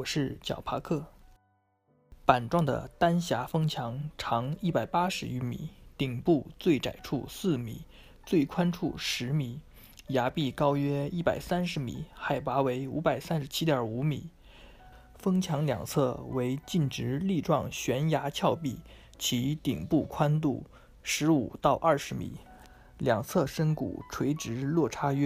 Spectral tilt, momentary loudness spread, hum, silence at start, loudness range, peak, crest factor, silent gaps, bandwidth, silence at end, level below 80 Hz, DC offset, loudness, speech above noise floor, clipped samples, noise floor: -6 dB/octave; 9 LU; none; 0 s; 2 LU; -6 dBFS; 24 dB; none; 15.5 kHz; 0 s; -54 dBFS; under 0.1%; -30 LUFS; 42 dB; under 0.1%; -71 dBFS